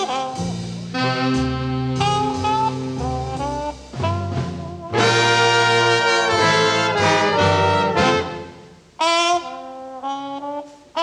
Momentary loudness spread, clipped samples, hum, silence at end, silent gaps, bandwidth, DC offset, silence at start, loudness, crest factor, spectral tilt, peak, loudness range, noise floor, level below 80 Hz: 15 LU; under 0.1%; none; 0 s; none; 11.5 kHz; under 0.1%; 0 s; -19 LUFS; 16 dB; -4 dB/octave; -4 dBFS; 7 LU; -43 dBFS; -42 dBFS